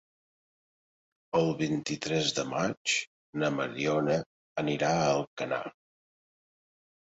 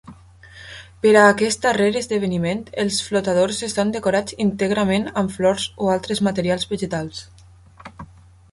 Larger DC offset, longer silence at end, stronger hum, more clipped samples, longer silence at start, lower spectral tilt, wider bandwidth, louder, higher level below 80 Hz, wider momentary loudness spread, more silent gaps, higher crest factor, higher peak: neither; first, 1.4 s vs 0.5 s; neither; neither; first, 1.35 s vs 0.05 s; about the same, -4.5 dB/octave vs -4.5 dB/octave; second, 8.2 kHz vs 11.5 kHz; second, -30 LUFS vs -20 LUFS; second, -66 dBFS vs -50 dBFS; second, 7 LU vs 13 LU; first, 2.77-2.85 s, 3.07-3.33 s, 4.26-4.55 s, 5.27-5.37 s vs none; about the same, 18 dB vs 18 dB; second, -14 dBFS vs -2 dBFS